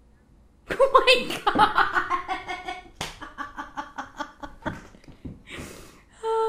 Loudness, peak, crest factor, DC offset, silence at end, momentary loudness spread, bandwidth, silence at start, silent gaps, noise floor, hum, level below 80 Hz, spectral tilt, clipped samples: -24 LUFS; -4 dBFS; 24 dB; under 0.1%; 0 s; 20 LU; 15.5 kHz; 0.7 s; none; -56 dBFS; none; -48 dBFS; -3 dB/octave; under 0.1%